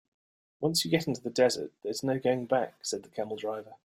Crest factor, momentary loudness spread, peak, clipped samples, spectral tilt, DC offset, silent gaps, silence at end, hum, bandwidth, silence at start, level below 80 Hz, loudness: 20 dB; 9 LU; -10 dBFS; under 0.1%; -4 dB/octave; under 0.1%; none; 0.1 s; none; 16 kHz; 0.6 s; -70 dBFS; -30 LUFS